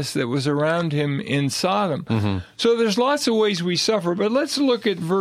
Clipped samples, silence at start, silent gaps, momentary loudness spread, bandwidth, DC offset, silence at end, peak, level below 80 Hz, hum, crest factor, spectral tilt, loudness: under 0.1%; 0 s; none; 4 LU; 15 kHz; under 0.1%; 0 s; -8 dBFS; -58 dBFS; none; 14 dB; -5 dB/octave; -21 LUFS